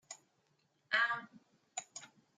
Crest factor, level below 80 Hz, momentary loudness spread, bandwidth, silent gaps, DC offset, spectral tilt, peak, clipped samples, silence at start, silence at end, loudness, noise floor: 24 dB; under -90 dBFS; 20 LU; 9.6 kHz; none; under 0.1%; 0 dB/octave; -18 dBFS; under 0.1%; 0.1 s; 0.3 s; -37 LUFS; -77 dBFS